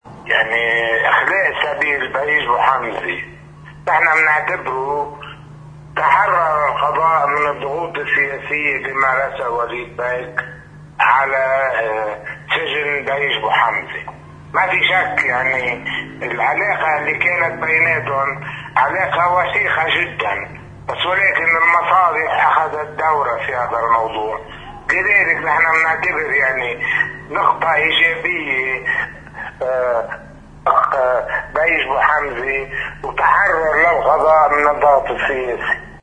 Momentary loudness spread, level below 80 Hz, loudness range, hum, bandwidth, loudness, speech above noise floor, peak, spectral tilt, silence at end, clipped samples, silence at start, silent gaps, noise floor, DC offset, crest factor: 11 LU; -46 dBFS; 4 LU; none; 10 kHz; -16 LUFS; 21 dB; 0 dBFS; -4.5 dB/octave; 0 s; under 0.1%; 0.05 s; none; -38 dBFS; under 0.1%; 18 dB